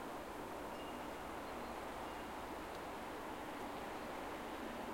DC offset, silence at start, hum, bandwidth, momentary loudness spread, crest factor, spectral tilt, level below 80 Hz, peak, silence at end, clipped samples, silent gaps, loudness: under 0.1%; 0 s; none; 16.5 kHz; 1 LU; 14 dB; -4.5 dB/octave; -64 dBFS; -34 dBFS; 0 s; under 0.1%; none; -47 LUFS